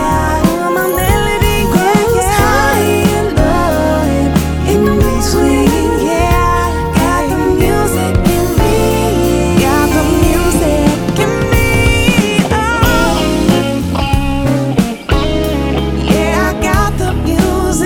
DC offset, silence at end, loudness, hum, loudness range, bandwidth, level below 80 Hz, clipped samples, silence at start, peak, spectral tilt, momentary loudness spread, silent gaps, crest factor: under 0.1%; 0 s; -12 LUFS; none; 2 LU; 19 kHz; -20 dBFS; under 0.1%; 0 s; 0 dBFS; -5.5 dB/octave; 4 LU; none; 12 dB